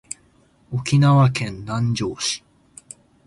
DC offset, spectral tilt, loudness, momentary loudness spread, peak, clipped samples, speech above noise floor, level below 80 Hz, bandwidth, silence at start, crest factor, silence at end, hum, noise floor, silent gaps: under 0.1%; -5.5 dB/octave; -20 LUFS; 21 LU; -6 dBFS; under 0.1%; 38 dB; -52 dBFS; 11.5 kHz; 0.7 s; 16 dB; 0.9 s; none; -57 dBFS; none